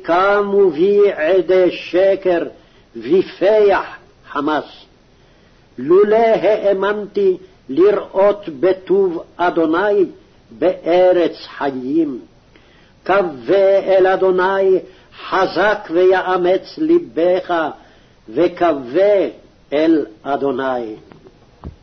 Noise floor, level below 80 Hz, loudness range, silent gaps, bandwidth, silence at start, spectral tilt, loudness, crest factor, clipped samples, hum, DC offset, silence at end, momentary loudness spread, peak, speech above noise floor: -49 dBFS; -52 dBFS; 3 LU; none; 6.4 kHz; 0 s; -7 dB/octave; -16 LUFS; 12 dB; under 0.1%; none; under 0.1%; 0.1 s; 10 LU; -4 dBFS; 35 dB